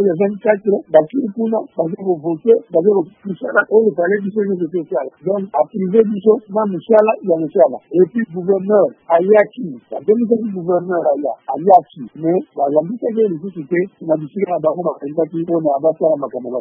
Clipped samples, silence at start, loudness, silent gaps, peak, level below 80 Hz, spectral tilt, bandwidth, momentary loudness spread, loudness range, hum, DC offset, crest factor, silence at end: under 0.1%; 0 s; -16 LUFS; none; 0 dBFS; -68 dBFS; -11 dB/octave; 3.6 kHz; 8 LU; 4 LU; none; under 0.1%; 16 dB; 0 s